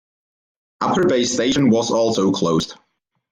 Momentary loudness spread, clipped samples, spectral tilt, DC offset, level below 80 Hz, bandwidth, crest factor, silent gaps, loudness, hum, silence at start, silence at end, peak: 6 LU; under 0.1%; -4.5 dB/octave; under 0.1%; -54 dBFS; 10.5 kHz; 14 dB; none; -18 LUFS; none; 0.8 s; 0.55 s; -6 dBFS